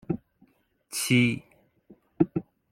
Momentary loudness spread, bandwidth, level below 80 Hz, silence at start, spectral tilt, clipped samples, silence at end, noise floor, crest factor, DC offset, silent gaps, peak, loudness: 13 LU; 16.5 kHz; -62 dBFS; 0.1 s; -5 dB/octave; under 0.1%; 0.3 s; -64 dBFS; 24 dB; under 0.1%; none; -6 dBFS; -27 LUFS